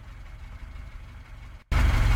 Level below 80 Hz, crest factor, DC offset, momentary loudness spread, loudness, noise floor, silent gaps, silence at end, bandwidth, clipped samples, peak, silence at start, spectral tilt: -28 dBFS; 16 dB; under 0.1%; 21 LU; -26 LUFS; -44 dBFS; none; 0 s; 15 kHz; under 0.1%; -12 dBFS; 0 s; -5.5 dB/octave